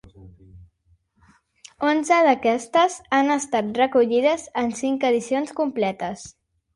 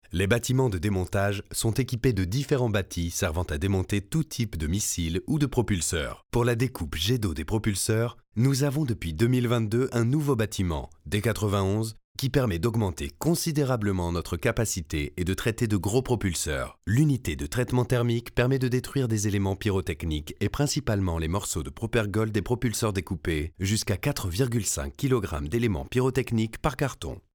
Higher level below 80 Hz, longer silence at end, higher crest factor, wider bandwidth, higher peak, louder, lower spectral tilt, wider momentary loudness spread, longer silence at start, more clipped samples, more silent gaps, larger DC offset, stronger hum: second, -60 dBFS vs -42 dBFS; first, 0.45 s vs 0.15 s; about the same, 16 dB vs 18 dB; second, 11.5 kHz vs over 20 kHz; about the same, -6 dBFS vs -8 dBFS; first, -21 LUFS vs -27 LUFS; second, -4 dB/octave vs -5.5 dB/octave; first, 8 LU vs 5 LU; about the same, 0.2 s vs 0.1 s; neither; second, none vs 12.04-12.15 s; neither; neither